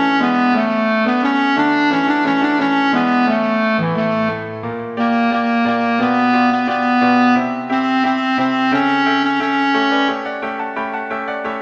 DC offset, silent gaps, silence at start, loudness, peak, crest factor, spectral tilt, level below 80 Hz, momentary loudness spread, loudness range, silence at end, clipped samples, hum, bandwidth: under 0.1%; none; 0 s; -16 LUFS; -2 dBFS; 14 dB; -6 dB/octave; -60 dBFS; 8 LU; 2 LU; 0 s; under 0.1%; none; 7.4 kHz